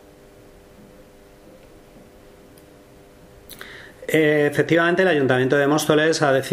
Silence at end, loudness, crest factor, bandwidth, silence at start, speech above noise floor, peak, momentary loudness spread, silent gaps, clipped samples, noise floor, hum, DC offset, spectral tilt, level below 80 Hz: 0 s; -18 LUFS; 18 dB; 15.5 kHz; 3.5 s; 30 dB; -4 dBFS; 21 LU; none; under 0.1%; -47 dBFS; none; under 0.1%; -5 dB/octave; -56 dBFS